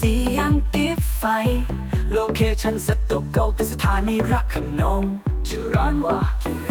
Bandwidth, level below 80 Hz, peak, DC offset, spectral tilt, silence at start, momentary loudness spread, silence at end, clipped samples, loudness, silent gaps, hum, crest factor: 19.5 kHz; -24 dBFS; -6 dBFS; under 0.1%; -6 dB/octave; 0 s; 5 LU; 0 s; under 0.1%; -22 LUFS; none; none; 14 dB